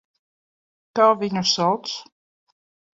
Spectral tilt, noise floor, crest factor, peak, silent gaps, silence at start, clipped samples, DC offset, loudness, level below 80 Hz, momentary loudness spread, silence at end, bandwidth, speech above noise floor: -4 dB/octave; under -90 dBFS; 20 dB; -4 dBFS; none; 0.95 s; under 0.1%; under 0.1%; -20 LUFS; -68 dBFS; 13 LU; 0.95 s; 7.8 kHz; over 70 dB